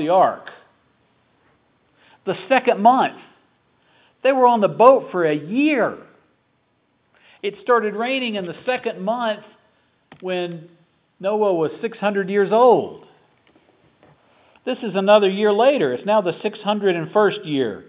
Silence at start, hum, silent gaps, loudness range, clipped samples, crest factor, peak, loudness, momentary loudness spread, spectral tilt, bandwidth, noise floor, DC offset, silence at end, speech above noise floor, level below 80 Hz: 0 s; none; none; 7 LU; under 0.1%; 20 dB; 0 dBFS; -19 LUFS; 14 LU; -9.5 dB/octave; 4 kHz; -65 dBFS; under 0.1%; 0.05 s; 47 dB; -74 dBFS